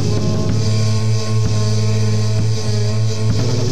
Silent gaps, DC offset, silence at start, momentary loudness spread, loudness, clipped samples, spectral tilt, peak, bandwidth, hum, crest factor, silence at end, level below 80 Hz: none; 10%; 0 s; 1 LU; -17 LUFS; under 0.1%; -6 dB/octave; -4 dBFS; 9.6 kHz; none; 10 dB; 0 s; -36 dBFS